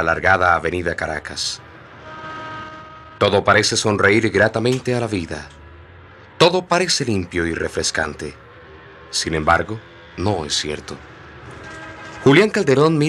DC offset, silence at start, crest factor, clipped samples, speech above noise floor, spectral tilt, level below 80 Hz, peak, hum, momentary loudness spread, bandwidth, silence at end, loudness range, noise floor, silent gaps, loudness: under 0.1%; 0 s; 18 dB; under 0.1%; 25 dB; -4 dB/octave; -48 dBFS; -2 dBFS; none; 21 LU; 13.5 kHz; 0 s; 5 LU; -43 dBFS; none; -18 LUFS